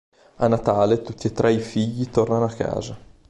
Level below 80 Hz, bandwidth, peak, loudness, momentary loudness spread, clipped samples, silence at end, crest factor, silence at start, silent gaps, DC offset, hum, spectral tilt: -48 dBFS; 11.5 kHz; -4 dBFS; -22 LUFS; 8 LU; under 0.1%; 0.3 s; 18 dB; 0.4 s; none; under 0.1%; none; -7 dB/octave